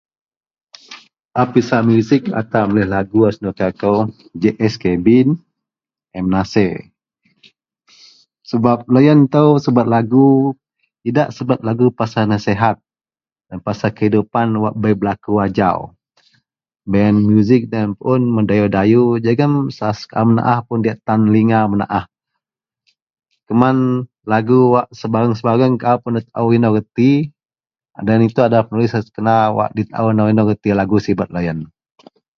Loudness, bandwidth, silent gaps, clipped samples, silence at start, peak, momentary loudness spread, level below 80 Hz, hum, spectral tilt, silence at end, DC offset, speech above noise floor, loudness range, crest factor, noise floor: -15 LUFS; 6.8 kHz; 1.25-1.29 s, 23.02-23.07 s; under 0.1%; 0.9 s; 0 dBFS; 9 LU; -46 dBFS; none; -8.5 dB/octave; 0.75 s; under 0.1%; over 76 dB; 4 LU; 16 dB; under -90 dBFS